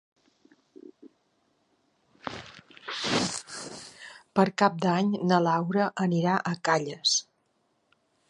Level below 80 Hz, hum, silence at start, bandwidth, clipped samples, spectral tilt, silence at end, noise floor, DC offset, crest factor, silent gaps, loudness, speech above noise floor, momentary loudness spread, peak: -68 dBFS; none; 0.85 s; 11.5 kHz; under 0.1%; -4.5 dB/octave; 1.05 s; -72 dBFS; under 0.1%; 24 dB; none; -26 LUFS; 47 dB; 19 LU; -6 dBFS